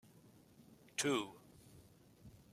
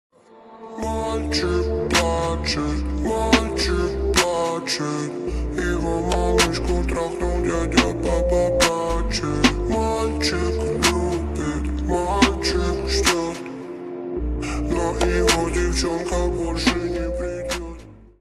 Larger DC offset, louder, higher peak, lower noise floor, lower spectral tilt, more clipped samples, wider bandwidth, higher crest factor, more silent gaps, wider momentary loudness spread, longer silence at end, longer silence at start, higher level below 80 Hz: neither; second, -40 LUFS vs -22 LUFS; second, -24 dBFS vs 0 dBFS; first, -65 dBFS vs -46 dBFS; second, -3 dB/octave vs -4.5 dB/octave; neither; first, 16 kHz vs 13.5 kHz; about the same, 22 dB vs 22 dB; neither; first, 26 LU vs 9 LU; about the same, 0.15 s vs 0.15 s; first, 1 s vs 0.35 s; second, -76 dBFS vs -28 dBFS